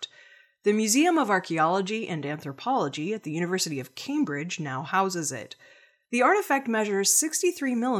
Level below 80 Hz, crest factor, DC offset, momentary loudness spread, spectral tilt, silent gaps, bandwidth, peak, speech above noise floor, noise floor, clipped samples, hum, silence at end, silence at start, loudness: -82 dBFS; 18 dB; under 0.1%; 11 LU; -3.5 dB/octave; none; 17 kHz; -8 dBFS; 29 dB; -55 dBFS; under 0.1%; none; 0 s; 0 s; -26 LUFS